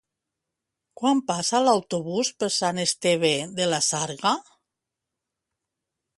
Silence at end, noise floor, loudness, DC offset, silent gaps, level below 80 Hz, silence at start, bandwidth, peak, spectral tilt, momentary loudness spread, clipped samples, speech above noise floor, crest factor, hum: 1.75 s; -85 dBFS; -24 LUFS; under 0.1%; none; -70 dBFS; 1 s; 11.5 kHz; -6 dBFS; -3 dB/octave; 5 LU; under 0.1%; 61 dB; 20 dB; none